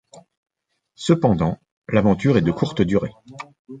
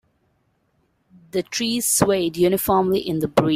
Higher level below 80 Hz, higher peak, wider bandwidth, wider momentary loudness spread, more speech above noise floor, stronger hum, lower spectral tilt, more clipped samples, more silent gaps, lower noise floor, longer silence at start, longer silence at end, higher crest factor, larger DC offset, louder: first, -46 dBFS vs -52 dBFS; about the same, -2 dBFS vs -2 dBFS; second, 9.2 kHz vs 16 kHz; first, 21 LU vs 7 LU; about the same, 44 dB vs 47 dB; neither; first, -7.5 dB/octave vs -4 dB/octave; neither; first, 0.37-0.43 s, 1.72-1.82 s, 3.59-3.65 s vs none; about the same, -63 dBFS vs -66 dBFS; second, 0.15 s vs 1.35 s; about the same, 0 s vs 0 s; about the same, 20 dB vs 20 dB; neither; about the same, -20 LUFS vs -20 LUFS